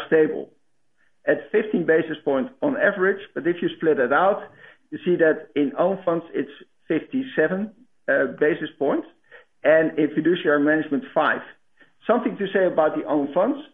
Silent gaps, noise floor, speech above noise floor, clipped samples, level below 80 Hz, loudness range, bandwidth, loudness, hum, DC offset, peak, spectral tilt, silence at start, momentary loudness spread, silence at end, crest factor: none; -69 dBFS; 48 dB; under 0.1%; -70 dBFS; 3 LU; 3.9 kHz; -22 LUFS; none; under 0.1%; -4 dBFS; -9.5 dB/octave; 0 s; 10 LU; 0.1 s; 18 dB